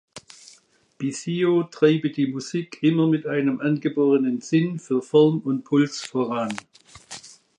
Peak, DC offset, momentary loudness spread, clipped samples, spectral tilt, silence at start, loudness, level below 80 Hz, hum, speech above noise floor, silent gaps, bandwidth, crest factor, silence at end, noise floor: -4 dBFS; under 0.1%; 14 LU; under 0.1%; -6.5 dB/octave; 0.15 s; -22 LUFS; -70 dBFS; none; 35 dB; none; 11 kHz; 18 dB; 0.3 s; -57 dBFS